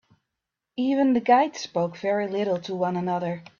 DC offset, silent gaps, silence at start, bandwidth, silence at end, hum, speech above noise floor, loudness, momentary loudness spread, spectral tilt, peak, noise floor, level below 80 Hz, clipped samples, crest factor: under 0.1%; none; 0.75 s; 7.2 kHz; 0.15 s; none; 61 dB; -24 LUFS; 8 LU; -6 dB/octave; -6 dBFS; -85 dBFS; -70 dBFS; under 0.1%; 18 dB